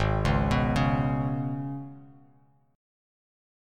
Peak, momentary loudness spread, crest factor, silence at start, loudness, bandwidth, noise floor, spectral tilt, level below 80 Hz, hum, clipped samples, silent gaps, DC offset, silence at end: -12 dBFS; 12 LU; 18 dB; 0 s; -27 LUFS; 11 kHz; -62 dBFS; -7.5 dB/octave; -38 dBFS; none; under 0.1%; none; under 0.1%; 1.65 s